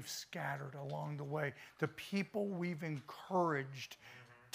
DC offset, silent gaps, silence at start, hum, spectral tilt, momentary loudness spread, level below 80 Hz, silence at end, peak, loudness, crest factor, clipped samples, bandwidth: under 0.1%; none; 0 s; none; -5.5 dB/octave; 12 LU; -82 dBFS; 0.05 s; -20 dBFS; -41 LUFS; 20 dB; under 0.1%; 15.5 kHz